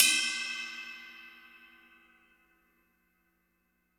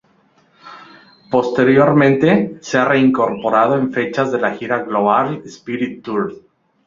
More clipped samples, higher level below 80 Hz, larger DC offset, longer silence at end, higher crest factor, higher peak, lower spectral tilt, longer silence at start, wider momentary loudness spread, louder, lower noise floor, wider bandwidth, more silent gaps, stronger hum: neither; second, -82 dBFS vs -58 dBFS; neither; first, 2.4 s vs 0.5 s; first, 32 dB vs 16 dB; second, -4 dBFS vs 0 dBFS; second, 3.5 dB/octave vs -7 dB/octave; second, 0 s vs 0.65 s; first, 26 LU vs 11 LU; second, -31 LUFS vs -16 LUFS; first, -76 dBFS vs -56 dBFS; first, over 20 kHz vs 7.4 kHz; neither; first, 60 Hz at -80 dBFS vs none